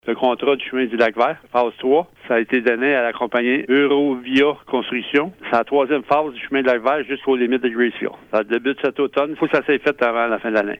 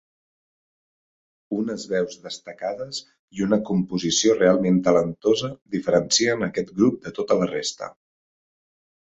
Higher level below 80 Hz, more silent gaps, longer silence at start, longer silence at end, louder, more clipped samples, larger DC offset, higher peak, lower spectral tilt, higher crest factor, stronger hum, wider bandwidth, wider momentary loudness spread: about the same, -62 dBFS vs -60 dBFS; second, none vs 3.19-3.28 s; second, 0.05 s vs 1.5 s; second, 0.05 s vs 1.2 s; first, -19 LUFS vs -22 LUFS; neither; neither; about the same, -4 dBFS vs -4 dBFS; first, -6 dB/octave vs -4.5 dB/octave; about the same, 16 dB vs 20 dB; neither; second, 6.8 kHz vs 8.2 kHz; second, 4 LU vs 13 LU